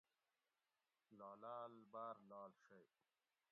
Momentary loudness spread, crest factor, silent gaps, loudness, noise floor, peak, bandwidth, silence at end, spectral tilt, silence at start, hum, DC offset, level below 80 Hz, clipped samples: 7 LU; 20 dB; none; -57 LUFS; under -90 dBFS; -42 dBFS; 4.3 kHz; 0.65 s; -5 dB/octave; 1.1 s; none; under 0.1%; under -90 dBFS; under 0.1%